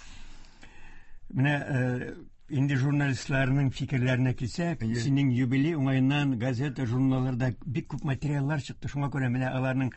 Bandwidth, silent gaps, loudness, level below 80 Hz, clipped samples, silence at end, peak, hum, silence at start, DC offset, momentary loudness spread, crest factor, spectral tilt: 8.4 kHz; none; -28 LUFS; -50 dBFS; under 0.1%; 0 s; -12 dBFS; none; 0 s; under 0.1%; 7 LU; 16 dB; -7 dB/octave